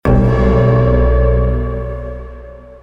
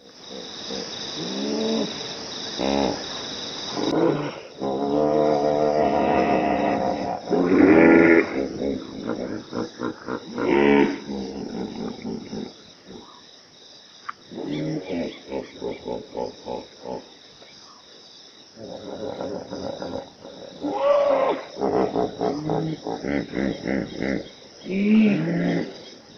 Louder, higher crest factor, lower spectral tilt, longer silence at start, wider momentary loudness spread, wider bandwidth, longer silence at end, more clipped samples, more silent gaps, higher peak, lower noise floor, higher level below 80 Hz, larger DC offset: first, -14 LUFS vs -23 LUFS; second, 12 dB vs 22 dB; first, -10 dB/octave vs -6 dB/octave; about the same, 0.05 s vs 0.05 s; about the same, 18 LU vs 20 LU; second, 5.2 kHz vs 6.8 kHz; about the same, 0.1 s vs 0 s; neither; neither; about the same, -2 dBFS vs -2 dBFS; second, -33 dBFS vs -48 dBFS; first, -18 dBFS vs -54 dBFS; neither